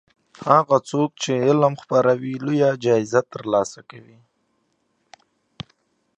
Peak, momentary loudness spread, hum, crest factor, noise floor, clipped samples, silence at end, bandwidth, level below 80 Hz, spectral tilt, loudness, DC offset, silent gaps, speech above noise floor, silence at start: 0 dBFS; 22 LU; none; 20 dB; -69 dBFS; under 0.1%; 2.2 s; 9.8 kHz; -66 dBFS; -6 dB/octave; -20 LUFS; under 0.1%; none; 49 dB; 0.4 s